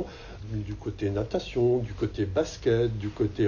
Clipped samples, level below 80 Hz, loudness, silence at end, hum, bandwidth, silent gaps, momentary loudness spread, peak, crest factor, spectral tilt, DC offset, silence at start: under 0.1%; -44 dBFS; -29 LUFS; 0 s; none; 7.2 kHz; none; 10 LU; -12 dBFS; 16 dB; -7 dB/octave; under 0.1%; 0 s